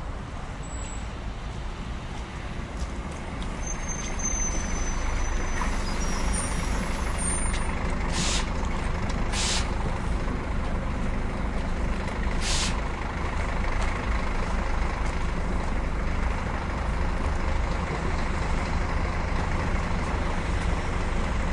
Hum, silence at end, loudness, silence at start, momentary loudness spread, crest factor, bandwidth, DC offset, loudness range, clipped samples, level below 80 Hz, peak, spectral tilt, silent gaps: none; 0 s; -30 LUFS; 0 s; 9 LU; 14 dB; 11.5 kHz; under 0.1%; 3 LU; under 0.1%; -28 dBFS; -12 dBFS; -4 dB/octave; none